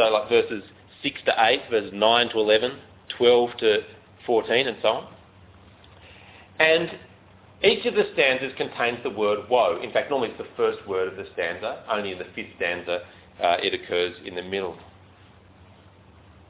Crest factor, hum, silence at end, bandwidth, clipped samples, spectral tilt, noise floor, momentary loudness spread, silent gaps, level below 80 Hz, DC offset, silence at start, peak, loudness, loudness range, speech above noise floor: 20 dB; none; 1.65 s; 4 kHz; under 0.1%; -7.5 dB/octave; -52 dBFS; 12 LU; none; -60 dBFS; under 0.1%; 0 s; -4 dBFS; -23 LUFS; 6 LU; 28 dB